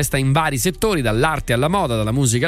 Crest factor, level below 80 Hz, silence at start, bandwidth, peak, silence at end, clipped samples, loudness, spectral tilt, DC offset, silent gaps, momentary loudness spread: 14 dB; -34 dBFS; 0 s; 16.5 kHz; -4 dBFS; 0 s; under 0.1%; -18 LUFS; -5 dB/octave; under 0.1%; none; 2 LU